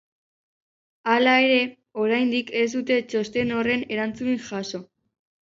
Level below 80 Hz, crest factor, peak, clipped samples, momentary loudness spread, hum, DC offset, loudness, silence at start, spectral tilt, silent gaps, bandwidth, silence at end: -62 dBFS; 18 dB; -6 dBFS; under 0.1%; 13 LU; none; under 0.1%; -23 LUFS; 1.05 s; -4.5 dB/octave; none; 7.6 kHz; 0.6 s